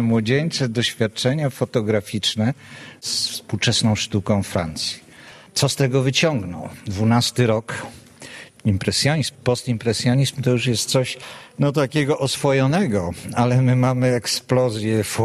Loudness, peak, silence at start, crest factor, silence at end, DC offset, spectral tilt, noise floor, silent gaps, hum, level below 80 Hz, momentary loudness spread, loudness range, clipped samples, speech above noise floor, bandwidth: -20 LUFS; -4 dBFS; 0 s; 18 dB; 0 s; under 0.1%; -5 dB/octave; -44 dBFS; none; none; -52 dBFS; 12 LU; 2 LU; under 0.1%; 24 dB; 13 kHz